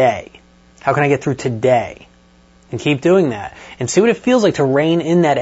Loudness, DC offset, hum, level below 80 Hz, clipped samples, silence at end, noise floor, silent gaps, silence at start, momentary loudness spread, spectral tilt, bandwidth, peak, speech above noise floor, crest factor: -16 LUFS; under 0.1%; none; -52 dBFS; under 0.1%; 0 s; -49 dBFS; none; 0 s; 13 LU; -6 dB/octave; 8 kHz; 0 dBFS; 34 dB; 16 dB